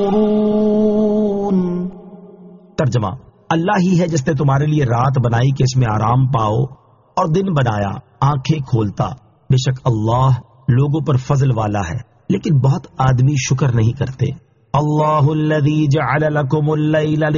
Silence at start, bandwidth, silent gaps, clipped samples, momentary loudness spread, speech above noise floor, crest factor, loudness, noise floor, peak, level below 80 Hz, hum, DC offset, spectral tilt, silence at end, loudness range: 0 s; 7.2 kHz; none; under 0.1%; 7 LU; 25 dB; 14 dB; -16 LUFS; -40 dBFS; -2 dBFS; -42 dBFS; none; under 0.1%; -7.5 dB/octave; 0 s; 3 LU